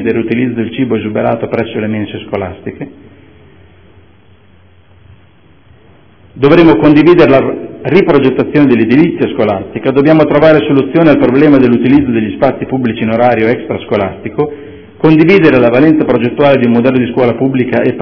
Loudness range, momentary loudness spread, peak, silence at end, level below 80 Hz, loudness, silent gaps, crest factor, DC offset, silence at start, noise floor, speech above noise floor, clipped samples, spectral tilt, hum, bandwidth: 10 LU; 11 LU; 0 dBFS; 0 s; -40 dBFS; -9 LUFS; none; 10 dB; under 0.1%; 0 s; -44 dBFS; 36 dB; 3%; -9.5 dB/octave; none; 5.4 kHz